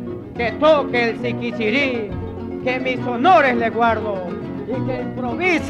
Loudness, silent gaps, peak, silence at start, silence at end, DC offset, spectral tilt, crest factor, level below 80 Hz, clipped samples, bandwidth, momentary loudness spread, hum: -19 LUFS; none; -4 dBFS; 0 s; 0 s; under 0.1%; -6.5 dB/octave; 16 dB; -46 dBFS; under 0.1%; 10.5 kHz; 13 LU; none